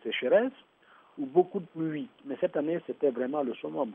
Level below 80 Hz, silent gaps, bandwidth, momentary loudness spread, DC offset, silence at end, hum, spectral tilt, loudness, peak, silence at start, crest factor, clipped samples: -82 dBFS; none; 3.7 kHz; 12 LU; under 0.1%; 0 s; none; -9 dB/octave; -30 LUFS; -10 dBFS; 0.05 s; 20 dB; under 0.1%